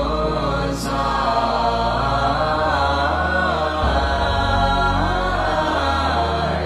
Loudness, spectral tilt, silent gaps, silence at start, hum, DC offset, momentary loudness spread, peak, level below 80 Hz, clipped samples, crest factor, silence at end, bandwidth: -19 LUFS; -5.5 dB/octave; none; 0 s; none; 0.1%; 2 LU; -4 dBFS; -28 dBFS; under 0.1%; 14 dB; 0 s; 14 kHz